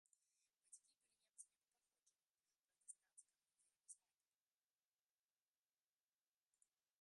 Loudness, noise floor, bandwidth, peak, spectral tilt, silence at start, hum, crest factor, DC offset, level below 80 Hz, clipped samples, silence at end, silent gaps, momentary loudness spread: -66 LUFS; under -90 dBFS; 11 kHz; -42 dBFS; 2.5 dB/octave; 0.4 s; none; 32 dB; under 0.1%; under -90 dBFS; under 0.1%; 3.05 s; none; 4 LU